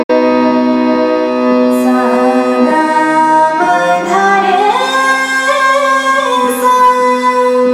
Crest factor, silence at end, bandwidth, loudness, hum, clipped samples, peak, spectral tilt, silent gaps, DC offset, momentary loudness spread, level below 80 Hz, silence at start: 10 dB; 0 s; 15.5 kHz; -10 LUFS; none; under 0.1%; 0 dBFS; -3.5 dB/octave; 0.04-0.09 s; under 0.1%; 3 LU; -56 dBFS; 0 s